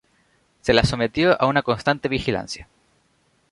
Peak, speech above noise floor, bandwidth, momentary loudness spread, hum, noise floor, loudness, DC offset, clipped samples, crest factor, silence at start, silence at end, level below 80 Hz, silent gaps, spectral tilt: 0 dBFS; 44 dB; 11.5 kHz; 10 LU; none; -64 dBFS; -21 LUFS; under 0.1%; under 0.1%; 22 dB; 0.65 s; 0.9 s; -42 dBFS; none; -5.5 dB/octave